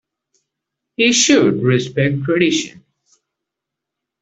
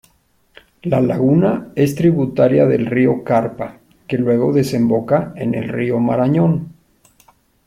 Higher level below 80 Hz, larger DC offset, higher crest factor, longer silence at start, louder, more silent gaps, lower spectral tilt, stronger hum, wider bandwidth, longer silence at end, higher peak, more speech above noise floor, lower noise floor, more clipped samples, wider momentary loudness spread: second, -58 dBFS vs -52 dBFS; neither; about the same, 18 dB vs 16 dB; first, 1 s vs 0.85 s; about the same, -15 LUFS vs -16 LUFS; neither; second, -4 dB/octave vs -8.5 dB/octave; neither; second, 8.4 kHz vs 15.5 kHz; first, 1.55 s vs 1 s; about the same, 0 dBFS vs 0 dBFS; first, 67 dB vs 43 dB; first, -82 dBFS vs -58 dBFS; neither; about the same, 10 LU vs 9 LU